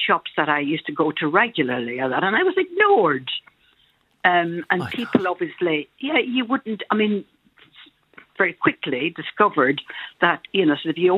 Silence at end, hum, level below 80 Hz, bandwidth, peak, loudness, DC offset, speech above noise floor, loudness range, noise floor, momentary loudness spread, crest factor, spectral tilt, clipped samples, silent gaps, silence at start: 0 s; none; -68 dBFS; 5.4 kHz; 0 dBFS; -21 LUFS; under 0.1%; 41 dB; 4 LU; -62 dBFS; 7 LU; 22 dB; -7 dB/octave; under 0.1%; none; 0 s